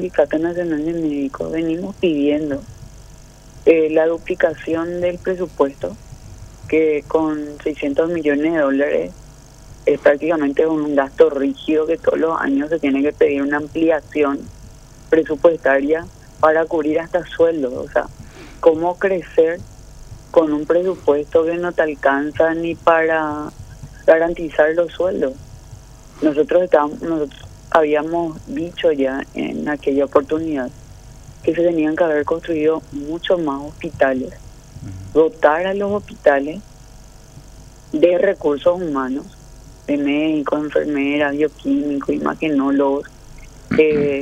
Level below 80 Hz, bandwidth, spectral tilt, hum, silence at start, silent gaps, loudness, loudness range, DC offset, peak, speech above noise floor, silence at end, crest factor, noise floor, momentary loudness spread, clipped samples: -44 dBFS; 10 kHz; -6.5 dB/octave; none; 0 s; none; -18 LUFS; 3 LU; under 0.1%; 0 dBFS; 24 dB; 0 s; 18 dB; -41 dBFS; 10 LU; under 0.1%